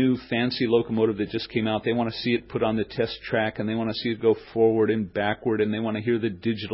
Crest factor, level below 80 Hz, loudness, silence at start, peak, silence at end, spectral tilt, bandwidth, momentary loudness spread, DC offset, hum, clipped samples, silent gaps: 16 dB; -54 dBFS; -25 LUFS; 0 s; -8 dBFS; 0 s; -10.5 dB/octave; 5.8 kHz; 5 LU; under 0.1%; none; under 0.1%; none